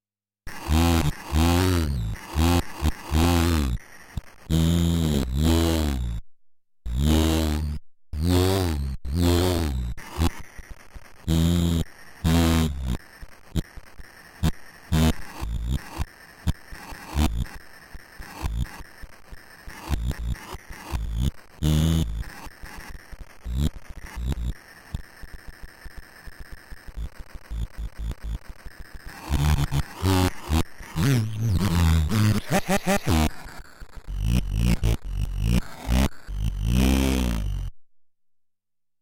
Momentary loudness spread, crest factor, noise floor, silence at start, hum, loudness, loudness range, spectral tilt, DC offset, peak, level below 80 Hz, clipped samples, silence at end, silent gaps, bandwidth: 23 LU; 16 dB; -73 dBFS; 0.45 s; none; -25 LUFS; 11 LU; -6 dB/octave; under 0.1%; -8 dBFS; -32 dBFS; under 0.1%; 1.15 s; none; 17 kHz